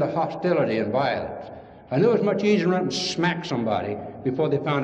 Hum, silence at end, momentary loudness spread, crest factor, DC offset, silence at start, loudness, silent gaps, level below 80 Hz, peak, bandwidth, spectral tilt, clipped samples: none; 0 s; 10 LU; 16 dB; under 0.1%; 0 s; -24 LUFS; none; -60 dBFS; -8 dBFS; 9.2 kHz; -6 dB/octave; under 0.1%